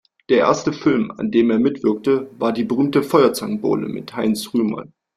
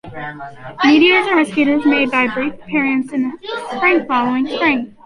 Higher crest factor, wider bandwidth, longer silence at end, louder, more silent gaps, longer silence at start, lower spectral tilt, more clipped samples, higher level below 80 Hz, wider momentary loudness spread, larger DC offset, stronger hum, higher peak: about the same, 16 dB vs 14 dB; first, 15 kHz vs 11 kHz; first, 0.35 s vs 0.15 s; second, -19 LUFS vs -15 LUFS; neither; first, 0.3 s vs 0.05 s; about the same, -6 dB/octave vs -5 dB/octave; neither; about the same, -58 dBFS vs -54 dBFS; second, 7 LU vs 16 LU; neither; neither; about the same, -2 dBFS vs -2 dBFS